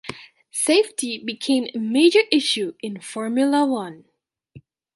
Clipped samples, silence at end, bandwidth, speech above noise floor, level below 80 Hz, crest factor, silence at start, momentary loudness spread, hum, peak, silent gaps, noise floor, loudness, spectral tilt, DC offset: under 0.1%; 0.35 s; 11.5 kHz; 29 dB; -68 dBFS; 20 dB; 0.05 s; 15 LU; none; -2 dBFS; none; -49 dBFS; -20 LUFS; -3 dB/octave; under 0.1%